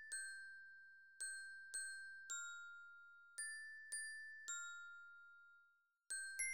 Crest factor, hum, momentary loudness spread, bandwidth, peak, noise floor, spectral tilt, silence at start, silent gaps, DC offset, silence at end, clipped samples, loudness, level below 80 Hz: 20 dB; none; 14 LU; over 20 kHz; -32 dBFS; -78 dBFS; 4.5 dB/octave; 0 s; none; under 0.1%; 0 s; under 0.1%; -50 LUFS; under -90 dBFS